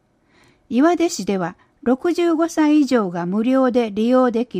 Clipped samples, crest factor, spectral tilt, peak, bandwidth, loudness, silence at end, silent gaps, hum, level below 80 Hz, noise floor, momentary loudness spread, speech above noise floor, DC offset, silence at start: under 0.1%; 14 dB; -5.5 dB/octave; -4 dBFS; 15.5 kHz; -18 LUFS; 0 s; none; none; -60 dBFS; -56 dBFS; 7 LU; 39 dB; under 0.1%; 0.7 s